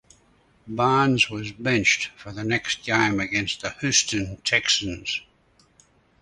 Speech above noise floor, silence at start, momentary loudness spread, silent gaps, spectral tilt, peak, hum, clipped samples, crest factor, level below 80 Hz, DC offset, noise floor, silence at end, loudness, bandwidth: 37 dB; 0.65 s; 10 LU; none; -3 dB/octave; -4 dBFS; none; under 0.1%; 20 dB; -52 dBFS; under 0.1%; -61 dBFS; 1 s; -22 LUFS; 11.5 kHz